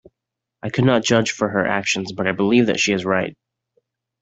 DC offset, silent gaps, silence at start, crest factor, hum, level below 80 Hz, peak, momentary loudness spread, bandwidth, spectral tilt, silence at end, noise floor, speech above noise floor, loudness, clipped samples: under 0.1%; none; 0.65 s; 18 dB; none; -58 dBFS; -2 dBFS; 7 LU; 8.2 kHz; -4.5 dB/octave; 0.9 s; -83 dBFS; 64 dB; -19 LUFS; under 0.1%